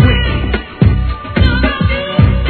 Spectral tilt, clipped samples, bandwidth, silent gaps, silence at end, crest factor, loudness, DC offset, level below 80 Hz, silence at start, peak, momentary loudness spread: -10 dB/octave; 0.3%; 4.5 kHz; none; 0 s; 12 dB; -14 LUFS; under 0.1%; -16 dBFS; 0 s; 0 dBFS; 5 LU